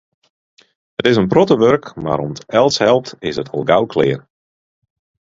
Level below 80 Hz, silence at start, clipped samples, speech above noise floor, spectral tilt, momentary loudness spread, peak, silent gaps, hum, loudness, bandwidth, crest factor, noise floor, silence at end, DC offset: -50 dBFS; 1 s; under 0.1%; over 75 dB; -5.5 dB/octave; 10 LU; 0 dBFS; none; none; -15 LUFS; 7.8 kHz; 16 dB; under -90 dBFS; 1.2 s; under 0.1%